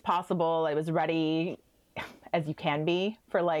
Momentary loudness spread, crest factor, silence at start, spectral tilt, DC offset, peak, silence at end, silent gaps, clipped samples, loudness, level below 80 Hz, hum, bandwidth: 14 LU; 14 dB; 0.05 s; -7 dB/octave; under 0.1%; -14 dBFS; 0 s; none; under 0.1%; -30 LUFS; -70 dBFS; none; 13 kHz